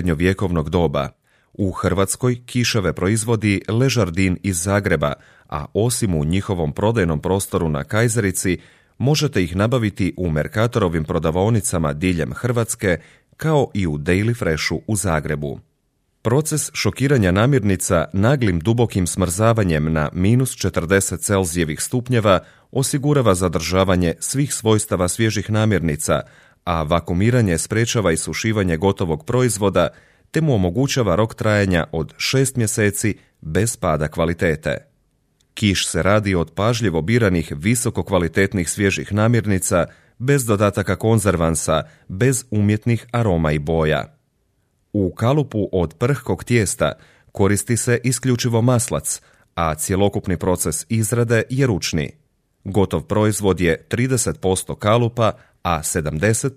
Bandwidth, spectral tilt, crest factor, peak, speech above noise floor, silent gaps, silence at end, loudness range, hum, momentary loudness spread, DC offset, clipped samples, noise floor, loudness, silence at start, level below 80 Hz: 15.5 kHz; -5 dB/octave; 18 dB; -2 dBFS; 48 dB; none; 0 s; 2 LU; none; 6 LU; under 0.1%; under 0.1%; -67 dBFS; -19 LUFS; 0 s; -40 dBFS